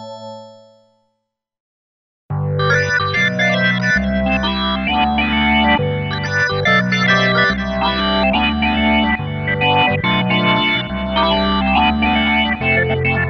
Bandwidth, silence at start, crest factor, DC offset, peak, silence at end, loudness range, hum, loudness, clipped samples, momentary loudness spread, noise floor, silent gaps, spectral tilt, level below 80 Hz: 7.2 kHz; 0 s; 14 dB; under 0.1%; -2 dBFS; 0 s; 3 LU; none; -15 LUFS; under 0.1%; 6 LU; -74 dBFS; 1.60-2.29 s; -5.5 dB/octave; -32 dBFS